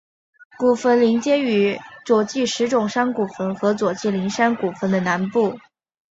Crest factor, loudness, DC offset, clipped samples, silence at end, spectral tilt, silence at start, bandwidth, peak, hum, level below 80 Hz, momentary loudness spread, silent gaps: 18 dB; -20 LUFS; under 0.1%; under 0.1%; 0.5 s; -5.5 dB/octave; 0.6 s; 8 kHz; -4 dBFS; none; -64 dBFS; 6 LU; none